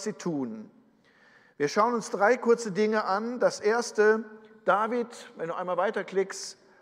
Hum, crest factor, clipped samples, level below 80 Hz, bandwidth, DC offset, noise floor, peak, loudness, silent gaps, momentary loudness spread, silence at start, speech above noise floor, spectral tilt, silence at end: none; 18 dB; under 0.1%; -84 dBFS; 12 kHz; under 0.1%; -61 dBFS; -10 dBFS; -27 LUFS; none; 14 LU; 0 s; 34 dB; -4.5 dB/octave; 0.3 s